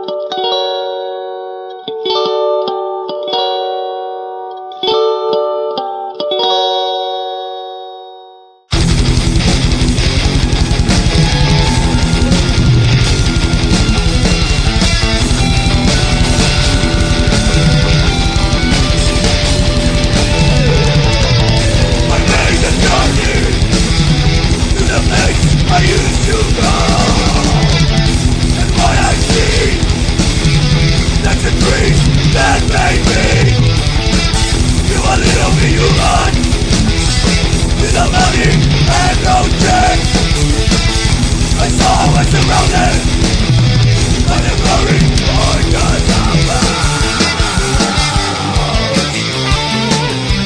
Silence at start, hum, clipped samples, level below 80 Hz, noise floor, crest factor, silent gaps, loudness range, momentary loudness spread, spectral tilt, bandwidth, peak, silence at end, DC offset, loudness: 0 s; none; under 0.1%; -16 dBFS; -39 dBFS; 10 dB; none; 5 LU; 6 LU; -4.5 dB/octave; 10.5 kHz; 0 dBFS; 0 s; under 0.1%; -12 LUFS